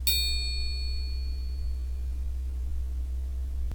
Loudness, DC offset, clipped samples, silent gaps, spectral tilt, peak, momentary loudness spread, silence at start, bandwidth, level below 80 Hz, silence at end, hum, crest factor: -32 LUFS; under 0.1%; under 0.1%; none; -2.5 dB/octave; -8 dBFS; 8 LU; 0 s; over 20 kHz; -32 dBFS; 0 s; none; 22 dB